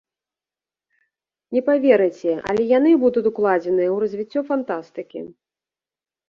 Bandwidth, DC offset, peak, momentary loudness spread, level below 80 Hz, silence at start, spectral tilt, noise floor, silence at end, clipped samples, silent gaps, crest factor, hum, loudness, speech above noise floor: 7.2 kHz; under 0.1%; -4 dBFS; 17 LU; -64 dBFS; 1.5 s; -7.5 dB/octave; under -90 dBFS; 1 s; under 0.1%; none; 18 dB; none; -19 LUFS; over 71 dB